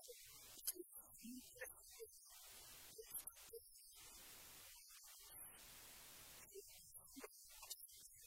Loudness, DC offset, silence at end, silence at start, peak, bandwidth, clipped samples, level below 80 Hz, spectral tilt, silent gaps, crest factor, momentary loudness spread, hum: -56 LUFS; under 0.1%; 0 s; 0 s; -28 dBFS; 16.5 kHz; under 0.1%; -80 dBFS; -1 dB/octave; none; 30 dB; 8 LU; none